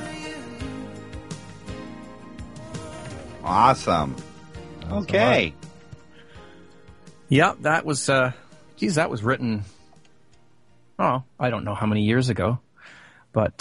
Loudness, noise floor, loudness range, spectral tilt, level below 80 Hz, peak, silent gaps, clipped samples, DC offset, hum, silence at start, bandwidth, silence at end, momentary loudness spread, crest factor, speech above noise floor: -23 LUFS; -60 dBFS; 4 LU; -5.5 dB/octave; -50 dBFS; -2 dBFS; none; under 0.1%; 0.3%; none; 0 s; 11.5 kHz; 0.1 s; 22 LU; 24 dB; 39 dB